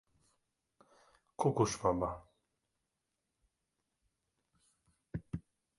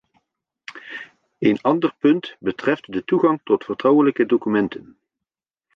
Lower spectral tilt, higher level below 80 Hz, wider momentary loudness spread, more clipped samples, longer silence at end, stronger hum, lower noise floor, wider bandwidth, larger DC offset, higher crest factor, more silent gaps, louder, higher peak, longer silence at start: second, -6 dB/octave vs -8 dB/octave; about the same, -62 dBFS vs -64 dBFS; second, 16 LU vs 19 LU; neither; second, 0.4 s vs 0.95 s; neither; about the same, -87 dBFS vs -87 dBFS; first, 11.5 kHz vs 6.4 kHz; neither; first, 26 dB vs 18 dB; neither; second, -35 LUFS vs -20 LUFS; second, -16 dBFS vs -4 dBFS; first, 1.4 s vs 0.7 s